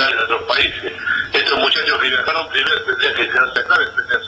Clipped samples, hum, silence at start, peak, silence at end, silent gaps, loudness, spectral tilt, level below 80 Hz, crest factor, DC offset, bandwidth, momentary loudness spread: under 0.1%; none; 0 s; -4 dBFS; 0 s; none; -16 LUFS; -2.5 dB/octave; -50 dBFS; 14 dB; under 0.1%; 8.8 kHz; 4 LU